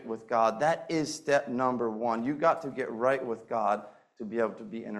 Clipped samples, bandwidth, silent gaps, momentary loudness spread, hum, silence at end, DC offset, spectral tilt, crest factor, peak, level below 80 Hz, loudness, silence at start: under 0.1%; 12.5 kHz; none; 7 LU; none; 0 s; under 0.1%; -5 dB/octave; 18 dB; -12 dBFS; -72 dBFS; -30 LUFS; 0 s